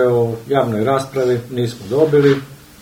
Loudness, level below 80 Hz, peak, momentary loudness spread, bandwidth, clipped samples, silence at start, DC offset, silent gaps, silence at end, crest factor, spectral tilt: -17 LUFS; -52 dBFS; 0 dBFS; 8 LU; 16.5 kHz; under 0.1%; 0 s; under 0.1%; none; 0.25 s; 16 dB; -7 dB/octave